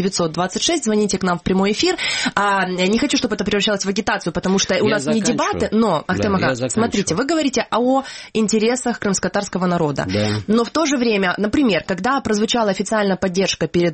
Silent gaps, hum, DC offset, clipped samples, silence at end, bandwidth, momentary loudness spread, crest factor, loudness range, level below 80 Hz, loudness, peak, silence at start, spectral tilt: none; none; under 0.1%; under 0.1%; 0 s; 8.8 kHz; 3 LU; 16 dB; 1 LU; -46 dBFS; -18 LUFS; -2 dBFS; 0 s; -4 dB/octave